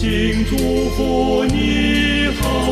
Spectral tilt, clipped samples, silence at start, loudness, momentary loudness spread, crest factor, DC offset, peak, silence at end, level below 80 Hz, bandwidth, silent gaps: -5 dB/octave; under 0.1%; 0 s; -17 LUFS; 3 LU; 12 dB; under 0.1%; -4 dBFS; 0 s; -24 dBFS; 15 kHz; none